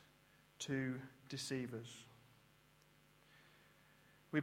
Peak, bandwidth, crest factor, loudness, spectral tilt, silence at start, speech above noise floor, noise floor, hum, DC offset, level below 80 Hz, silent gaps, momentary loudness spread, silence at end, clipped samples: -24 dBFS; 16.5 kHz; 24 dB; -46 LUFS; -4.5 dB/octave; 0 s; 26 dB; -70 dBFS; none; under 0.1%; -82 dBFS; none; 26 LU; 0 s; under 0.1%